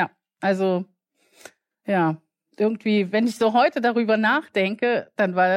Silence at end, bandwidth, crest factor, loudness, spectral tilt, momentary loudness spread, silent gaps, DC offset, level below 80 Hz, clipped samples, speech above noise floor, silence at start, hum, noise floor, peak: 0 s; 14 kHz; 14 dB; -22 LUFS; -6.5 dB/octave; 9 LU; none; under 0.1%; -76 dBFS; under 0.1%; 41 dB; 0 s; none; -62 dBFS; -8 dBFS